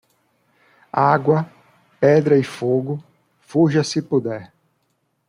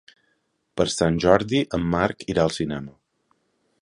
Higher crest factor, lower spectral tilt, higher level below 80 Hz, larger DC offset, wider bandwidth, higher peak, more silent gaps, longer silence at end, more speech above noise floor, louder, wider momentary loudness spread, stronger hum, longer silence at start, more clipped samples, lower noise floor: second, 18 dB vs 24 dB; first, -7 dB/octave vs -5.5 dB/octave; second, -64 dBFS vs -46 dBFS; neither; about the same, 11.5 kHz vs 11.5 kHz; about the same, -2 dBFS vs 0 dBFS; neither; about the same, 0.85 s vs 0.9 s; about the same, 52 dB vs 49 dB; first, -19 LUFS vs -22 LUFS; about the same, 13 LU vs 13 LU; neither; first, 0.95 s vs 0.75 s; neither; about the same, -69 dBFS vs -71 dBFS